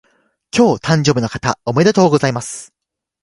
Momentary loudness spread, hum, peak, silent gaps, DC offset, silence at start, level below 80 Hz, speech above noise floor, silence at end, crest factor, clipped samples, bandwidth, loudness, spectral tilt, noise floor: 11 LU; none; 0 dBFS; none; under 0.1%; 0.55 s; -48 dBFS; 67 dB; 0.6 s; 16 dB; under 0.1%; 11.5 kHz; -15 LUFS; -5.5 dB/octave; -82 dBFS